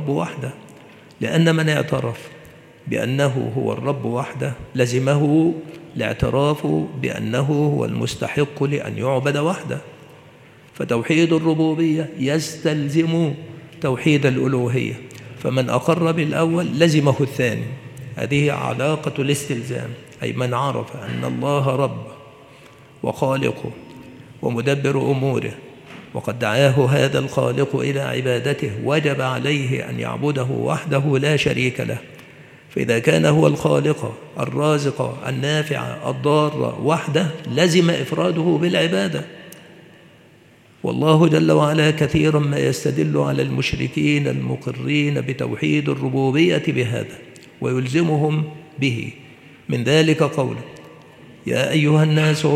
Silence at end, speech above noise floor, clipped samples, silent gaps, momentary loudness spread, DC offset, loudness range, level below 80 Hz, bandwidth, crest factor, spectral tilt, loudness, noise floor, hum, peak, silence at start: 0 s; 31 dB; under 0.1%; none; 13 LU; under 0.1%; 4 LU; -52 dBFS; 14.5 kHz; 20 dB; -6 dB/octave; -20 LUFS; -50 dBFS; none; 0 dBFS; 0 s